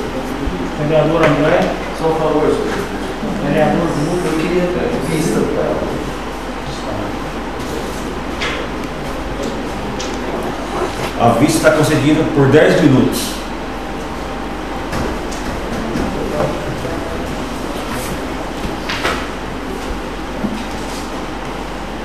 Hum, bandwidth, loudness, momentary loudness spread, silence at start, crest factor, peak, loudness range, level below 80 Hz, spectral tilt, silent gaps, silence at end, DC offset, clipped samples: none; 15.5 kHz; -18 LUFS; 12 LU; 0 s; 18 dB; 0 dBFS; 9 LU; -30 dBFS; -5.5 dB/octave; none; 0 s; 2%; under 0.1%